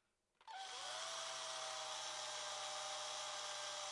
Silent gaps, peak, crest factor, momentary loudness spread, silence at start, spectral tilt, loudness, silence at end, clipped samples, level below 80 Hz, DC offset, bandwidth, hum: none; -34 dBFS; 14 dB; 5 LU; 0.4 s; 1.5 dB/octave; -45 LUFS; 0 s; under 0.1%; under -90 dBFS; under 0.1%; 11.5 kHz; none